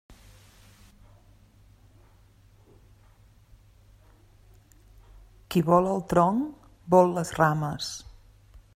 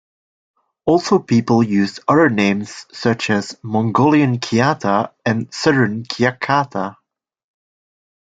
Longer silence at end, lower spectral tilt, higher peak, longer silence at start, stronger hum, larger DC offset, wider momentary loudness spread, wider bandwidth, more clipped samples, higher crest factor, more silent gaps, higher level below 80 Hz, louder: second, 0.75 s vs 1.4 s; about the same, -6.5 dB/octave vs -6 dB/octave; second, -6 dBFS vs 0 dBFS; second, 0.1 s vs 0.85 s; neither; neither; first, 14 LU vs 8 LU; first, 16 kHz vs 9.2 kHz; neither; first, 24 dB vs 18 dB; neither; about the same, -54 dBFS vs -56 dBFS; second, -24 LUFS vs -17 LUFS